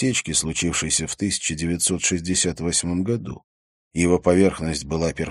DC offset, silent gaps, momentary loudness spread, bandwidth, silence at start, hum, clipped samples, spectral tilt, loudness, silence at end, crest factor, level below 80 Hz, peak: under 0.1%; 3.44-3.91 s; 8 LU; 13 kHz; 0 s; none; under 0.1%; -3.5 dB/octave; -21 LUFS; 0 s; 20 dB; -42 dBFS; -4 dBFS